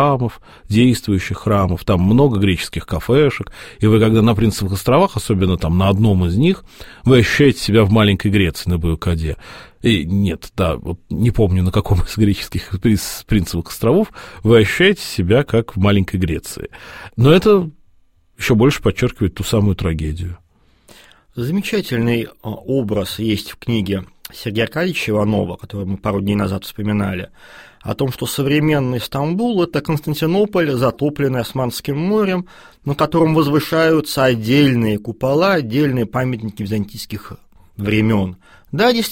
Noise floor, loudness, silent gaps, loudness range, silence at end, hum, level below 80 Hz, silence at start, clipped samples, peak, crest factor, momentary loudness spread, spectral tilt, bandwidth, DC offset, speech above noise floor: -52 dBFS; -17 LUFS; none; 5 LU; 0 s; none; -34 dBFS; 0 s; under 0.1%; 0 dBFS; 16 dB; 12 LU; -6.5 dB/octave; 16.5 kHz; 0.2%; 36 dB